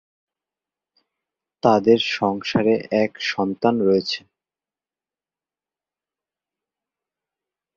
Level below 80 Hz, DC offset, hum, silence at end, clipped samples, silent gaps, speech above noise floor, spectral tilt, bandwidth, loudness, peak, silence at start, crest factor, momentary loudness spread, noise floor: -62 dBFS; under 0.1%; none; 3.55 s; under 0.1%; none; over 71 dB; -6 dB/octave; 7.4 kHz; -20 LUFS; -2 dBFS; 1.65 s; 22 dB; 6 LU; under -90 dBFS